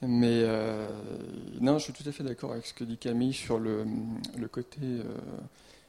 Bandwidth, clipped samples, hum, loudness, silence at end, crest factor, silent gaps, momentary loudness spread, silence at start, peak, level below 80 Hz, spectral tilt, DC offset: 13 kHz; under 0.1%; none; -32 LUFS; 0.15 s; 20 dB; none; 14 LU; 0 s; -12 dBFS; -62 dBFS; -6.5 dB/octave; under 0.1%